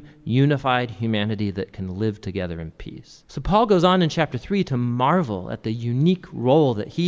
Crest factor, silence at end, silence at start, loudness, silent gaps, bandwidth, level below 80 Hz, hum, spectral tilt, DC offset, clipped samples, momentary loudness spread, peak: 18 dB; 0 s; 0 s; -22 LUFS; none; 7.8 kHz; -44 dBFS; none; -7.5 dB/octave; under 0.1%; under 0.1%; 13 LU; -4 dBFS